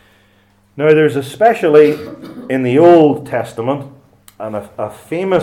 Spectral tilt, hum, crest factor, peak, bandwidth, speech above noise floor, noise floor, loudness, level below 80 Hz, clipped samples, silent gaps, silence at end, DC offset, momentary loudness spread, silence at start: -7 dB/octave; none; 14 dB; 0 dBFS; 13.5 kHz; 40 dB; -53 dBFS; -13 LUFS; -56 dBFS; 0.1%; none; 0 s; under 0.1%; 17 LU; 0.75 s